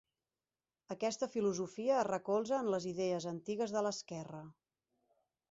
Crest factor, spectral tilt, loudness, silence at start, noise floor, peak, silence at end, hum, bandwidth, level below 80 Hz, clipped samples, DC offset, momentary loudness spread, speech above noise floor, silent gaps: 16 dB; -5 dB/octave; -37 LUFS; 0.9 s; under -90 dBFS; -22 dBFS; 1 s; none; 8 kHz; -80 dBFS; under 0.1%; under 0.1%; 13 LU; over 53 dB; none